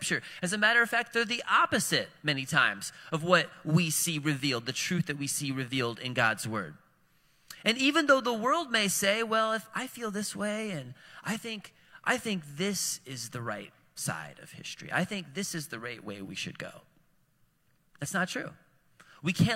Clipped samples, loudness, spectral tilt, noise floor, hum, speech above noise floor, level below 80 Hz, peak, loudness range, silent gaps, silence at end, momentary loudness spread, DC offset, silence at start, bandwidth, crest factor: under 0.1%; -29 LUFS; -3.5 dB/octave; -70 dBFS; none; 40 dB; -70 dBFS; -8 dBFS; 10 LU; none; 0 s; 15 LU; under 0.1%; 0 s; 16.5 kHz; 24 dB